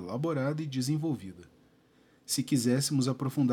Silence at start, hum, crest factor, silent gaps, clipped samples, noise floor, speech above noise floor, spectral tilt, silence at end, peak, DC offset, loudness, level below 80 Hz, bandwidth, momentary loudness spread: 0 s; none; 16 dB; none; under 0.1%; -64 dBFS; 34 dB; -5.5 dB/octave; 0 s; -16 dBFS; under 0.1%; -30 LUFS; -74 dBFS; 17 kHz; 9 LU